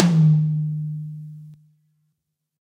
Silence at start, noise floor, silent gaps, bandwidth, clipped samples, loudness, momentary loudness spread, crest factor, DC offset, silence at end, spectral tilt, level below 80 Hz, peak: 0 s; -77 dBFS; none; 7.6 kHz; under 0.1%; -21 LUFS; 23 LU; 22 dB; under 0.1%; 1.15 s; -8 dB/octave; -64 dBFS; 0 dBFS